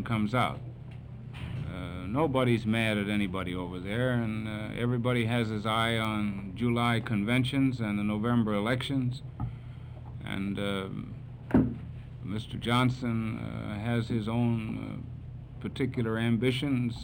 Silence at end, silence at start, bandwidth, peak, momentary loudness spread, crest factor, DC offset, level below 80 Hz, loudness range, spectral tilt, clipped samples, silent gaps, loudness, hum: 0 s; 0 s; 16 kHz; -12 dBFS; 14 LU; 18 dB; under 0.1%; -50 dBFS; 4 LU; -7 dB/octave; under 0.1%; none; -30 LUFS; none